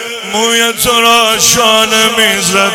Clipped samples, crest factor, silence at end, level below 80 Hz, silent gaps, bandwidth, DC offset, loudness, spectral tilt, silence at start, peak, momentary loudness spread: 0.4%; 10 dB; 0 s; -42 dBFS; none; over 20 kHz; under 0.1%; -8 LUFS; -1 dB/octave; 0 s; 0 dBFS; 4 LU